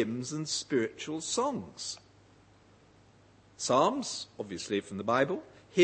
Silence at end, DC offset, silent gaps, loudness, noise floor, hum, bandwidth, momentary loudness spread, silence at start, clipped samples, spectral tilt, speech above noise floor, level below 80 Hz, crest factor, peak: 0 s; under 0.1%; none; -32 LUFS; -60 dBFS; none; 8.8 kHz; 13 LU; 0 s; under 0.1%; -3.5 dB/octave; 29 dB; -72 dBFS; 24 dB; -10 dBFS